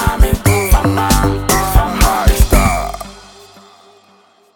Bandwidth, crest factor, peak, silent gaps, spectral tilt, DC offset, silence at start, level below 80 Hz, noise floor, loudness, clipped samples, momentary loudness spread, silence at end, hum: 19 kHz; 14 dB; 0 dBFS; none; -4.5 dB/octave; under 0.1%; 0 s; -16 dBFS; -49 dBFS; -13 LUFS; under 0.1%; 8 LU; 1.4 s; none